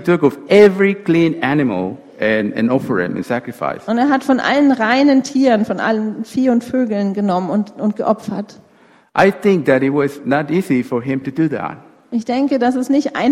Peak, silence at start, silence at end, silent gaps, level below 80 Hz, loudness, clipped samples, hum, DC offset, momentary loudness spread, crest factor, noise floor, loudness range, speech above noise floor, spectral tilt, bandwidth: 0 dBFS; 0 s; 0 s; none; -56 dBFS; -16 LUFS; under 0.1%; none; under 0.1%; 9 LU; 16 dB; -50 dBFS; 3 LU; 35 dB; -6.5 dB/octave; 13.5 kHz